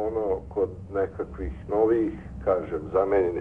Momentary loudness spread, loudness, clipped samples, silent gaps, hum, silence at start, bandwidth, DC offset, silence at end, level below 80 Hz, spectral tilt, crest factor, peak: 8 LU; -27 LUFS; under 0.1%; none; none; 0 s; 3.7 kHz; 0.1%; 0 s; -42 dBFS; -10 dB/octave; 16 dB; -12 dBFS